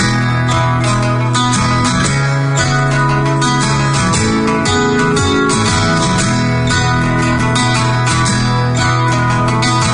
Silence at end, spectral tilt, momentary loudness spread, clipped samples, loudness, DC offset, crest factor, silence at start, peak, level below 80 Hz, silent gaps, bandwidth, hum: 0 s; -4.5 dB/octave; 1 LU; under 0.1%; -13 LUFS; under 0.1%; 12 dB; 0 s; -2 dBFS; -32 dBFS; none; 11 kHz; none